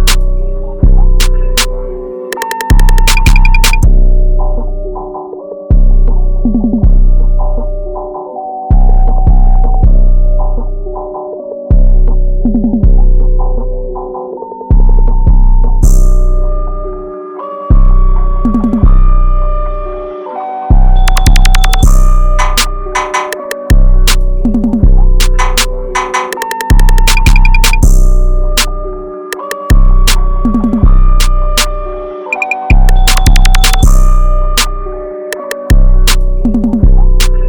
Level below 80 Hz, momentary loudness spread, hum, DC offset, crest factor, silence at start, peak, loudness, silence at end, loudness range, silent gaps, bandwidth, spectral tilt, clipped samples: -6 dBFS; 12 LU; none; under 0.1%; 6 dB; 0 s; 0 dBFS; -12 LUFS; 0 s; 3 LU; none; 19 kHz; -4.5 dB/octave; 4%